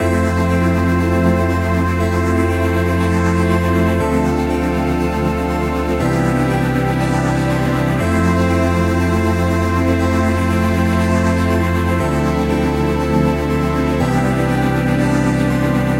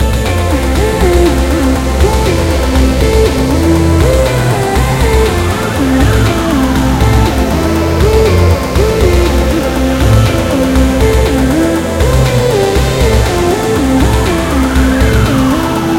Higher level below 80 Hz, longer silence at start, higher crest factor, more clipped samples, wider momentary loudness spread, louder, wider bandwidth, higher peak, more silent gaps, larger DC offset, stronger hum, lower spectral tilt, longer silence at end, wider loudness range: second, -28 dBFS vs -14 dBFS; about the same, 0 s vs 0 s; about the same, 12 dB vs 10 dB; second, under 0.1% vs 0.2%; about the same, 2 LU vs 3 LU; second, -16 LUFS vs -10 LUFS; about the same, 16 kHz vs 16.5 kHz; about the same, -2 dBFS vs 0 dBFS; neither; second, under 0.1% vs 0.4%; neither; about the same, -7 dB/octave vs -6 dB/octave; about the same, 0 s vs 0 s; about the same, 1 LU vs 1 LU